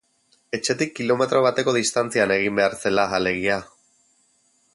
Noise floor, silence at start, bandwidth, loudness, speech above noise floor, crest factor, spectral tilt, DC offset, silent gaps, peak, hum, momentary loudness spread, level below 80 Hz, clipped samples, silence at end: -64 dBFS; 0.55 s; 11.5 kHz; -21 LUFS; 43 dB; 18 dB; -3.5 dB/octave; under 0.1%; none; -4 dBFS; none; 6 LU; -58 dBFS; under 0.1%; 1.1 s